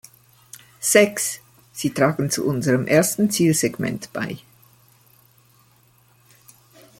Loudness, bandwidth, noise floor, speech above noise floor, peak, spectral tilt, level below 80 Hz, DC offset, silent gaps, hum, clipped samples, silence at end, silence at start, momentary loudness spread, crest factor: -20 LUFS; 17 kHz; -57 dBFS; 37 dB; -2 dBFS; -4.5 dB/octave; -60 dBFS; under 0.1%; none; none; under 0.1%; 2.6 s; 0.8 s; 14 LU; 22 dB